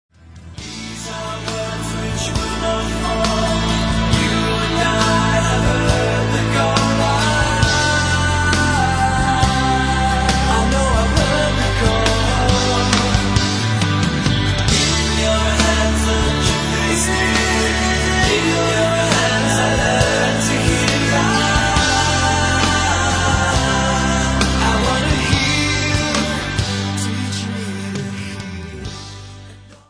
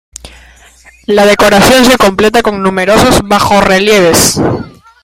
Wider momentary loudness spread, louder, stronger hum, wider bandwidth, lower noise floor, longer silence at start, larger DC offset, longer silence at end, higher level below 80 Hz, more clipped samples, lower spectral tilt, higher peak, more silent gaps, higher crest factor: about the same, 9 LU vs 8 LU; second, -16 LUFS vs -7 LUFS; neither; second, 10.5 kHz vs over 20 kHz; about the same, -39 dBFS vs -39 dBFS; about the same, 0.3 s vs 0.25 s; neither; second, 0.15 s vs 0.35 s; about the same, -26 dBFS vs -30 dBFS; second, under 0.1% vs 0.5%; about the same, -4 dB/octave vs -3.5 dB/octave; about the same, 0 dBFS vs 0 dBFS; neither; first, 16 dB vs 8 dB